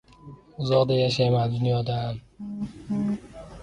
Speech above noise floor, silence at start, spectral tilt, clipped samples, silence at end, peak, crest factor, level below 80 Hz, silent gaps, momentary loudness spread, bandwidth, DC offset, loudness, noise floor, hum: 23 dB; 0.25 s; -7 dB/octave; under 0.1%; 0 s; -10 dBFS; 16 dB; -52 dBFS; none; 16 LU; 9.8 kHz; under 0.1%; -25 LUFS; -47 dBFS; none